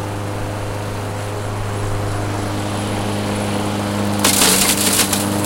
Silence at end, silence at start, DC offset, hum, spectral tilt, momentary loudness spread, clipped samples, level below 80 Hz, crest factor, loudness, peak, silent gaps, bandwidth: 0 s; 0 s; under 0.1%; none; -3.5 dB/octave; 13 LU; under 0.1%; -34 dBFS; 18 dB; -18 LUFS; 0 dBFS; none; 17 kHz